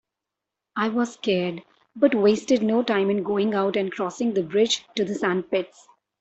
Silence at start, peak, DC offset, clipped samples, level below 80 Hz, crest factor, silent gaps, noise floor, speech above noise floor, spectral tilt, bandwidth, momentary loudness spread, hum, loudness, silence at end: 0.75 s; -6 dBFS; under 0.1%; under 0.1%; -68 dBFS; 18 dB; none; -86 dBFS; 63 dB; -5 dB/octave; 8.2 kHz; 8 LU; none; -23 LUFS; 0.55 s